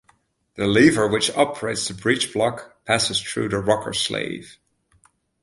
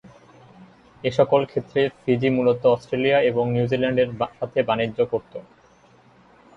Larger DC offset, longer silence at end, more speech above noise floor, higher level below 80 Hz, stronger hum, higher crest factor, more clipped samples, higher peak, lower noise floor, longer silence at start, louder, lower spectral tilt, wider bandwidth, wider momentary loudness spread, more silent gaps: neither; second, 0.9 s vs 1.15 s; first, 41 dB vs 33 dB; first, -52 dBFS vs -58 dBFS; neither; about the same, 20 dB vs 18 dB; neither; about the same, -2 dBFS vs -4 dBFS; first, -62 dBFS vs -54 dBFS; about the same, 0.55 s vs 0.6 s; about the same, -21 LUFS vs -22 LUFS; second, -3.5 dB/octave vs -7.5 dB/octave; first, 11.5 kHz vs 7.6 kHz; first, 10 LU vs 7 LU; neither